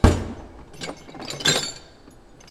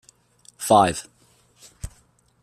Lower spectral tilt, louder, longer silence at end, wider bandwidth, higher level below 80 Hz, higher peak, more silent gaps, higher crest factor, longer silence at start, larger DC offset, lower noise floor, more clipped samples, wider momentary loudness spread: about the same, -4 dB/octave vs -4.5 dB/octave; second, -24 LUFS vs -20 LUFS; first, 0.7 s vs 0.55 s; about the same, 14.5 kHz vs 15 kHz; first, -32 dBFS vs -50 dBFS; first, 0 dBFS vs -4 dBFS; neither; about the same, 24 dB vs 22 dB; second, 0 s vs 0.6 s; neither; second, -48 dBFS vs -59 dBFS; neither; second, 20 LU vs 23 LU